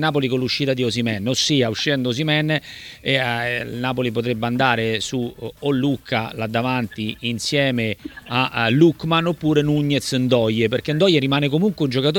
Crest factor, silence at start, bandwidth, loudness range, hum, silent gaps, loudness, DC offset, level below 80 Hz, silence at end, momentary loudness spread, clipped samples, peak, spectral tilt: 18 dB; 0 s; 18.5 kHz; 4 LU; none; none; -20 LUFS; under 0.1%; -52 dBFS; 0 s; 7 LU; under 0.1%; -2 dBFS; -5 dB/octave